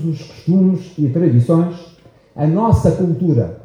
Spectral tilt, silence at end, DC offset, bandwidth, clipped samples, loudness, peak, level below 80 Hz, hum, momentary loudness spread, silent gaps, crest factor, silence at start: -10 dB/octave; 0.05 s; under 0.1%; 10.5 kHz; under 0.1%; -16 LUFS; 0 dBFS; -36 dBFS; none; 9 LU; none; 14 dB; 0 s